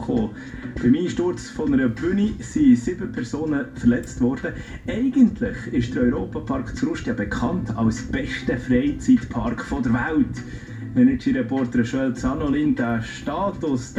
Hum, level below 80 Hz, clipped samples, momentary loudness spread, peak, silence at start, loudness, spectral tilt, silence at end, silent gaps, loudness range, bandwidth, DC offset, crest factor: none; -40 dBFS; under 0.1%; 9 LU; -4 dBFS; 0 s; -22 LUFS; -7 dB/octave; 0 s; none; 2 LU; 9.4 kHz; under 0.1%; 16 dB